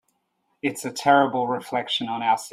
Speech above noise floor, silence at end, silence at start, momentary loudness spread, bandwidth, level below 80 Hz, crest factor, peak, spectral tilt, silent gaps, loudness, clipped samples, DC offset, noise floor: 50 dB; 0.05 s; 0.65 s; 10 LU; 16 kHz; -72 dBFS; 20 dB; -4 dBFS; -4 dB/octave; none; -23 LUFS; under 0.1%; under 0.1%; -72 dBFS